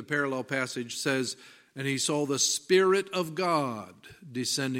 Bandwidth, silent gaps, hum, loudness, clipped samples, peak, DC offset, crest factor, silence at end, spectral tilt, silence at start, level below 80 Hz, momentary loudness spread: 16 kHz; none; none; -28 LUFS; under 0.1%; -12 dBFS; under 0.1%; 18 dB; 0 s; -3 dB/octave; 0 s; -76 dBFS; 15 LU